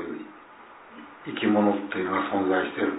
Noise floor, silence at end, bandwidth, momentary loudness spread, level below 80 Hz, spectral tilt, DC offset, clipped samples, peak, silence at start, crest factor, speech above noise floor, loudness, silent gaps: -48 dBFS; 0 s; 4 kHz; 23 LU; -70 dBFS; -10 dB/octave; under 0.1%; under 0.1%; -10 dBFS; 0 s; 18 dB; 24 dB; -26 LUFS; none